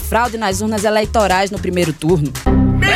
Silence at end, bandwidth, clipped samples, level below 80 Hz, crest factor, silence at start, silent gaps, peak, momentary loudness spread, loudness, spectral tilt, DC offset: 0 s; 17 kHz; under 0.1%; -26 dBFS; 14 dB; 0 s; none; -2 dBFS; 4 LU; -16 LUFS; -5 dB/octave; under 0.1%